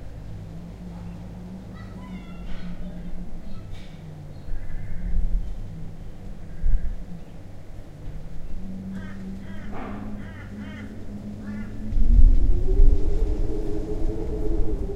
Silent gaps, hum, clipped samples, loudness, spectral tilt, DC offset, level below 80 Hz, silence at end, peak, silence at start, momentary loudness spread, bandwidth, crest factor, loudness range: none; none; under 0.1%; -31 LUFS; -8.5 dB/octave; under 0.1%; -24 dBFS; 0 s; -2 dBFS; 0 s; 17 LU; 3.8 kHz; 20 dB; 12 LU